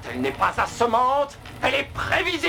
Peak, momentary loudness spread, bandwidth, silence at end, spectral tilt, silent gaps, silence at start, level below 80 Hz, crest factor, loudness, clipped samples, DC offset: -8 dBFS; 6 LU; over 20 kHz; 0 s; -4 dB/octave; none; 0 s; -46 dBFS; 16 dB; -23 LUFS; under 0.1%; under 0.1%